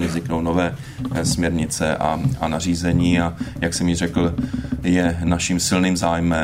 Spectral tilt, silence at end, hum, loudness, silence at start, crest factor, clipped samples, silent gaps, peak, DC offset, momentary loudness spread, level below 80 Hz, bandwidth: -5 dB/octave; 0 s; none; -20 LUFS; 0 s; 16 dB; under 0.1%; none; -4 dBFS; under 0.1%; 7 LU; -36 dBFS; 16 kHz